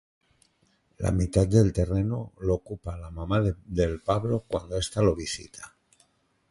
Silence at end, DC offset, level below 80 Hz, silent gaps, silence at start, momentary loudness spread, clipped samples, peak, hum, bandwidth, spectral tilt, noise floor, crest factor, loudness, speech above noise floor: 0.85 s; under 0.1%; -40 dBFS; none; 1 s; 15 LU; under 0.1%; -8 dBFS; none; 11.5 kHz; -6.5 dB/octave; -68 dBFS; 20 dB; -27 LUFS; 42 dB